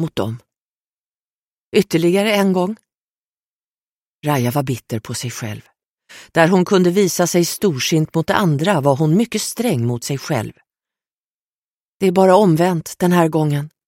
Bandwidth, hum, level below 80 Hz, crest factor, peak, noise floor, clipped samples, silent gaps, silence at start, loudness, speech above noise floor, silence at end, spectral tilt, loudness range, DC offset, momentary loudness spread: 16.5 kHz; none; -58 dBFS; 18 dB; 0 dBFS; under -90 dBFS; under 0.1%; 0.61-1.72 s, 3.02-4.01 s, 4.07-4.22 s, 5.85-5.98 s, 11.13-12.00 s; 0 s; -17 LUFS; over 74 dB; 0.2 s; -5.5 dB/octave; 6 LU; under 0.1%; 12 LU